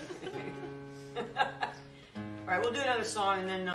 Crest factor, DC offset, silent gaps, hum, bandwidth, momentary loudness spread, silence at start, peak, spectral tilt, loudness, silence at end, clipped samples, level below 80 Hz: 22 dB; under 0.1%; none; none; 13 kHz; 14 LU; 0 s; -14 dBFS; -3.5 dB/octave; -34 LUFS; 0 s; under 0.1%; -68 dBFS